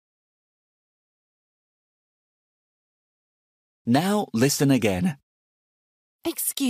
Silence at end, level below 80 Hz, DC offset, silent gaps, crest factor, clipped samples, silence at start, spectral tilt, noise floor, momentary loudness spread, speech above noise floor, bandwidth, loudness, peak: 0 s; -62 dBFS; under 0.1%; 5.23-6.19 s; 20 dB; under 0.1%; 3.85 s; -5 dB/octave; under -90 dBFS; 13 LU; over 68 dB; 15.5 kHz; -23 LUFS; -8 dBFS